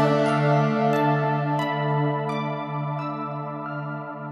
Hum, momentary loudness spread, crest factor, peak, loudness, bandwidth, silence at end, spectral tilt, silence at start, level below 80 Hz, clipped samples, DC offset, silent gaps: none; 11 LU; 16 dB; -8 dBFS; -24 LUFS; 11 kHz; 0 s; -8 dB/octave; 0 s; -70 dBFS; under 0.1%; under 0.1%; none